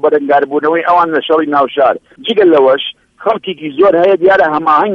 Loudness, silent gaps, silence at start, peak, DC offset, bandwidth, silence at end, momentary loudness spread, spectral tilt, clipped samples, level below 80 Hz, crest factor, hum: -11 LUFS; none; 0.05 s; 0 dBFS; under 0.1%; 6.4 kHz; 0 s; 9 LU; -6.5 dB/octave; under 0.1%; -54 dBFS; 10 dB; none